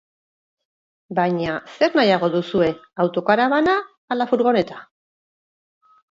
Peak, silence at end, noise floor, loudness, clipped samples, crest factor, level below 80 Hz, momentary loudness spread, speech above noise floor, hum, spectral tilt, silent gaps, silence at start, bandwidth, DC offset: -2 dBFS; 1.3 s; under -90 dBFS; -20 LUFS; under 0.1%; 18 dB; -60 dBFS; 10 LU; over 71 dB; none; -7 dB/octave; 3.98-4.08 s; 1.1 s; 7.6 kHz; under 0.1%